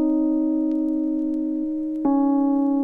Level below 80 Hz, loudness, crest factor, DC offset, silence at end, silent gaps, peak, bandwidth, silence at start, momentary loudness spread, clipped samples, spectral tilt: -54 dBFS; -22 LUFS; 10 dB; under 0.1%; 0 s; none; -12 dBFS; 1.8 kHz; 0 s; 5 LU; under 0.1%; -10 dB/octave